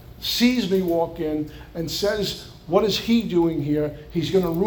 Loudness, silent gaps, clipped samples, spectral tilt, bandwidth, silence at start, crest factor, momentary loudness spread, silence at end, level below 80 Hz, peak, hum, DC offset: -23 LUFS; none; under 0.1%; -5.5 dB/octave; over 20 kHz; 0 s; 18 dB; 9 LU; 0 s; -46 dBFS; -4 dBFS; none; under 0.1%